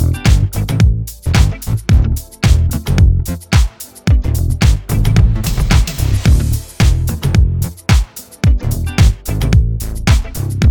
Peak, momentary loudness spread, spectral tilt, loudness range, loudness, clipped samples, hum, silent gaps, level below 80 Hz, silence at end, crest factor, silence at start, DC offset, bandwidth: 0 dBFS; 6 LU; -5.5 dB/octave; 1 LU; -14 LUFS; under 0.1%; none; none; -16 dBFS; 0 s; 12 dB; 0 s; under 0.1%; 19.5 kHz